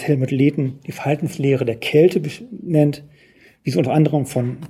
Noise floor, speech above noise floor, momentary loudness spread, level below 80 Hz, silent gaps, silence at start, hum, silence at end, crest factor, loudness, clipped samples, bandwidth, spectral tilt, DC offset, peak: -51 dBFS; 33 dB; 12 LU; -60 dBFS; none; 0 s; none; 0 s; 16 dB; -19 LUFS; under 0.1%; 14.5 kHz; -7.5 dB/octave; under 0.1%; -2 dBFS